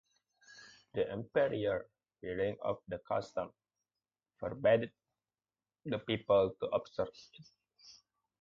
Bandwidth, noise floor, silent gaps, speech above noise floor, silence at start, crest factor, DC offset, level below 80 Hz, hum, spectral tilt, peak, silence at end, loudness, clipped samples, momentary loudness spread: 7.4 kHz; under -90 dBFS; none; over 55 dB; 0.55 s; 20 dB; under 0.1%; -66 dBFS; none; -4.5 dB/octave; -18 dBFS; 0.45 s; -36 LUFS; under 0.1%; 17 LU